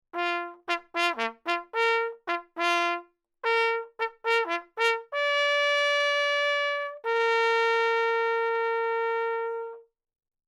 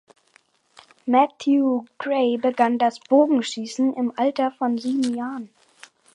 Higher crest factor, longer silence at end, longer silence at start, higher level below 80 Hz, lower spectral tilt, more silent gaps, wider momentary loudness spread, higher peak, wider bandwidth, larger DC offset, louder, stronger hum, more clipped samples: about the same, 18 dB vs 18 dB; about the same, 0.65 s vs 0.7 s; second, 0.15 s vs 1.05 s; about the same, -82 dBFS vs -78 dBFS; second, 0 dB/octave vs -4.5 dB/octave; neither; about the same, 9 LU vs 9 LU; second, -10 dBFS vs -4 dBFS; first, 12.5 kHz vs 11 kHz; neither; second, -26 LUFS vs -22 LUFS; neither; neither